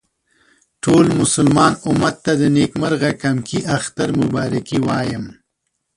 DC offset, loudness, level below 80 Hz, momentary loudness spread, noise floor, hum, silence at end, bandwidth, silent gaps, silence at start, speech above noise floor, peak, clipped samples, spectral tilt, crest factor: under 0.1%; -17 LUFS; -48 dBFS; 8 LU; -73 dBFS; none; 0.65 s; 11.5 kHz; none; 0.85 s; 57 dB; -2 dBFS; under 0.1%; -5.5 dB/octave; 16 dB